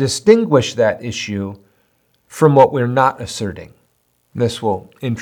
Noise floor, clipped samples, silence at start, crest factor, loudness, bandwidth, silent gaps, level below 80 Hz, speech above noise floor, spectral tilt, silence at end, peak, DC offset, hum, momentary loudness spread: -62 dBFS; under 0.1%; 0 s; 16 dB; -16 LUFS; 18 kHz; none; -56 dBFS; 47 dB; -5.5 dB/octave; 0 s; 0 dBFS; under 0.1%; none; 15 LU